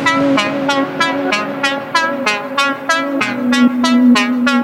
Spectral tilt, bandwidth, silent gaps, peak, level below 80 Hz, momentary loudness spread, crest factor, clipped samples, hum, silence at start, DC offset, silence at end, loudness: -3.5 dB/octave; 15 kHz; none; 0 dBFS; -58 dBFS; 6 LU; 14 dB; under 0.1%; none; 0 s; under 0.1%; 0 s; -14 LUFS